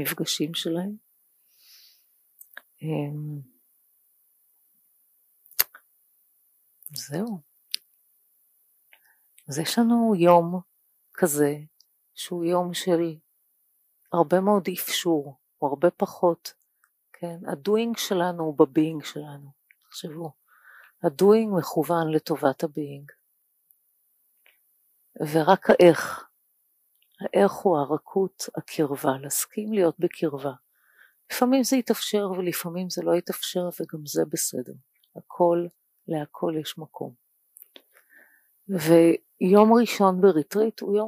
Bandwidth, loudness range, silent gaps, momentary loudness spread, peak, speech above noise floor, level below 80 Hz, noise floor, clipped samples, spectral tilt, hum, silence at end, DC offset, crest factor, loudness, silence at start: 15.5 kHz; 12 LU; none; 18 LU; -2 dBFS; 47 dB; -76 dBFS; -70 dBFS; under 0.1%; -5 dB/octave; none; 0 s; under 0.1%; 22 dB; -24 LUFS; 0 s